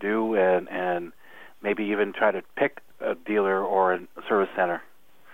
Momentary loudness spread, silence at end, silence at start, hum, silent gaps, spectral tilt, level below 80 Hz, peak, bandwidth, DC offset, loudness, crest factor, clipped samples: 9 LU; 0.5 s; 0 s; none; none; -7 dB/octave; -72 dBFS; -8 dBFS; 16 kHz; 0.4%; -26 LUFS; 18 dB; under 0.1%